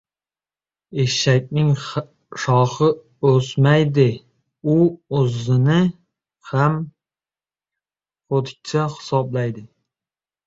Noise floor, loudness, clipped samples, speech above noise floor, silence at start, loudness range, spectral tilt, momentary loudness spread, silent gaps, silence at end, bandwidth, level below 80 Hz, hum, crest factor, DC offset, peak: under -90 dBFS; -19 LUFS; under 0.1%; over 72 dB; 0.9 s; 7 LU; -6.5 dB/octave; 11 LU; none; 0.8 s; 7.8 kHz; -56 dBFS; none; 18 dB; under 0.1%; -2 dBFS